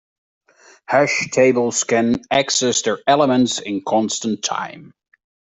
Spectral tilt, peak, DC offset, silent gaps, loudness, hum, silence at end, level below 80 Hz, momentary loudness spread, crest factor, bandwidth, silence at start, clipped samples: -3 dB/octave; -2 dBFS; under 0.1%; none; -18 LUFS; none; 0.75 s; -60 dBFS; 7 LU; 16 dB; 8.4 kHz; 0.9 s; under 0.1%